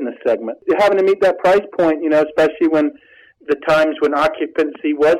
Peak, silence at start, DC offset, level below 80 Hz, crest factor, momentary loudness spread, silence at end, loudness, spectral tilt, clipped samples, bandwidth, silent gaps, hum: -6 dBFS; 0 s; under 0.1%; -54 dBFS; 10 dB; 6 LU; 0 s; -16 LUFS; -5.5 dB/octave; under 0.1%; 13 kHz; none; none